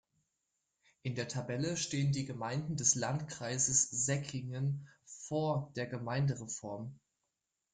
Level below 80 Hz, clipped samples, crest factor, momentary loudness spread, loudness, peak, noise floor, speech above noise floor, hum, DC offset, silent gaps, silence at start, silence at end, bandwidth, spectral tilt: -68 dBFS; under 0.1%; 22 dB; 14 LU; -35 LUFS; -16 dBFS; -87 dBFS; 51 dB; none; under 0.1%; none; 1.05 s; 0.75 s; 10 kHz; -4 dB/octave